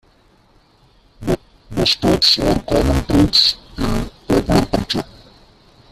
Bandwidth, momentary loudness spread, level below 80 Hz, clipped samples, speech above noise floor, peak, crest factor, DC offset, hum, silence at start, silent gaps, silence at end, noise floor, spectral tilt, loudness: 14.5 kHz; 12 LU; -30 dBFS; under 0.1%; 37 dB; 0 dBFS; 18 dB; under 0.1%; none; 1.2 s; none; 0.9 s; -53 dBFS; -5 dB/octave; -16 LUFS